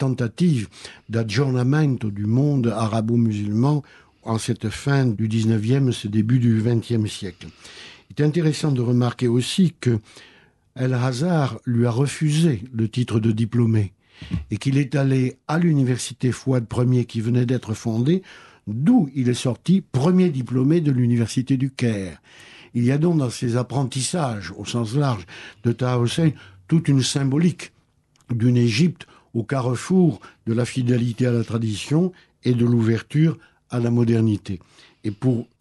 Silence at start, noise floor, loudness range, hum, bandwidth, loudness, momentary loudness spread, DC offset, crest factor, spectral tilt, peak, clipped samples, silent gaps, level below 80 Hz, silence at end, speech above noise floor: 0 s; -61 dBFS; 2 LU; none; 12 kHz; -21 LUFS; 11 LU; under 0.1%; 14 dB; -7 dB/octave; -6 dBFS; under 0.1%; none; -54 dBFS; 0.15 s; 40 dB